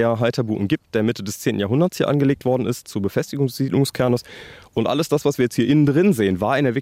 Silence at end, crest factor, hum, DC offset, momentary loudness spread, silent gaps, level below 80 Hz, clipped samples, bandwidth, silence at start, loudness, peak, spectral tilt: 0 s; 12 dB; none; under 0.1%; 7 LU; none; -56 dBFS; under 0.1%; 16.5 kHz; 0 s; -20 LUFS; -6 dBFS; -6.5 dB/octave